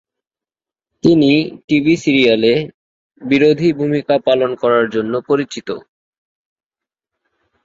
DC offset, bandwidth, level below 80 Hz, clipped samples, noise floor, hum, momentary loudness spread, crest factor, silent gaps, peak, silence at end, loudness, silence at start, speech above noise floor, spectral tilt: under 0.1%; 7.8 kHz; -54 dBFS; under 0.1%; -90 dBFS; none; 12 LU; 16 dB; 1.64-1.68 s, 2.74-3.10 s; -2 dBFS; 1.85 s; -14 LUFS; 1.05 s; 76 dB; -6.5 dB/octave